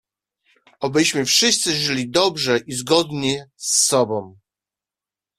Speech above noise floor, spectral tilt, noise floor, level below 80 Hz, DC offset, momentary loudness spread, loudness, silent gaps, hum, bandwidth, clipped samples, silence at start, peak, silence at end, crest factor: 70 dB; -2.5 dB/octave; -90 dBFS; -60 dBFS; under 0.1%; 9 LU; -18 LUFS; none; none; 15.5 kHz; under 0.1%; 0.8 s; -2 dBFS; 1.05 s; 20 dB